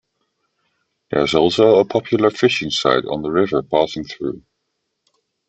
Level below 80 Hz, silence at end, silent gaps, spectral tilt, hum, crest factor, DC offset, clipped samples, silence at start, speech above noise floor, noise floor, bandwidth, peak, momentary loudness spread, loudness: -54 dBFS; 1.1 s; none; -5 dB/octave; none; 18 dB; under 0.1%; under 0.1%; 1.1 s; 57 dB; -74 dBFS; 8.4 kHz; -2 dBFS; 13 LU; -17 LUFS